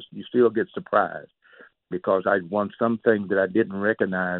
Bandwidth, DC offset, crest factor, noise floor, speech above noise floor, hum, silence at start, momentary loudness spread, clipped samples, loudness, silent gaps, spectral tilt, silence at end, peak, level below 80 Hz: 4.2 kHz; under 0.1%; 18 dB; -53 dBFS; 30 dB; none; 0 s; 8 LU; under 0.1%; -23 LUFS; none; -11 dB/octave; 0 s; -6 dBFS; -68 dBFS